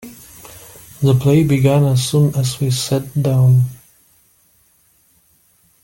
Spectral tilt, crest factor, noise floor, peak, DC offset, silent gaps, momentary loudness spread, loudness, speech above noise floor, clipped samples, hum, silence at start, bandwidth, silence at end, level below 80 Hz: -6.5 dB/octave; 14 dB; -56 dBFS; -2 dBFS; under 0.1%; none; 24 LU; -15 LUFS; 42 dB; under 0.1%; none; 0.05 s; 17 kHz; 2.1 s; -48 dBFS